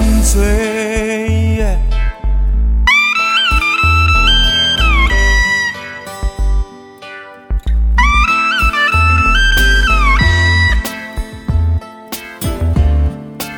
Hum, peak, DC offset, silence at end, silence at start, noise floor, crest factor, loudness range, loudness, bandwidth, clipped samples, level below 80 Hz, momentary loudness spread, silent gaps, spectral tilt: none; 0 dBFS; under 0.1%; 0 s; 0 s; -33 dBFS; 12 dB; 5 LU; -12 LUFS; 19 kHz; under 0.1%; -16 dBFS; 15 LU; none; -4 dB/octave